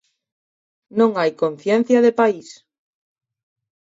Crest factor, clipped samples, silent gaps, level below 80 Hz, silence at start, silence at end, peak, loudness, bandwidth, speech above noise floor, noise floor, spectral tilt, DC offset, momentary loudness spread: 18 dB; under 0.1%; none; -72 dBFS; 0.95 s; 1.3 s; -4 dBFS; -18 LUFS; 7.8 kHz; over 73 dB; under -90 dBFS; -6 dB/octave; under 0.1%; 9 LU